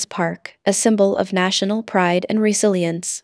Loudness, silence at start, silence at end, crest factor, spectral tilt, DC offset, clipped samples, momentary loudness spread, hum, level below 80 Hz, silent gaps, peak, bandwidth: -18 LUFS; 0 s; 0.05 s; 16 dB; -4 dB/octave; under 0.1%; under 0.1%; 7 LU; none; -68 dBFS; none; -2 dBFS; 11 kHz